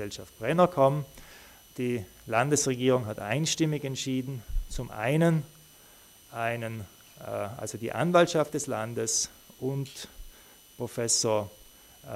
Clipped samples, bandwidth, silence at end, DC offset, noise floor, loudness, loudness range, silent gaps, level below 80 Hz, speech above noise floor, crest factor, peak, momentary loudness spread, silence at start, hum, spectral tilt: under 0.1%; 16 kHz; 0 s; under 0.1%; -55 dBFS; -28 LUFS; 4 LU; none; -46 dBFS; 27 dB; 20 dB; -8 dBFS; 18 LU; 0 s; none; -4.5 dB/octave